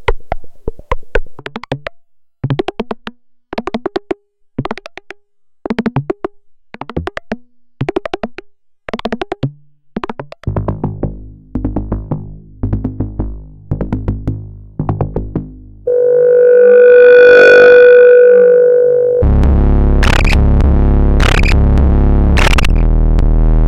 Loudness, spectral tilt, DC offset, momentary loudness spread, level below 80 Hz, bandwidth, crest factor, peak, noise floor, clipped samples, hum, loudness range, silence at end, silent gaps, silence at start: -10 LUFS; -7 dB/octave; under 0.1%; 22 LU; -16 dBFS; 10.5 kHz; 10 dB; 0 dBFS; -48 dBFS; under 0.1%; none; 18 LU; 0 s; none; 0 s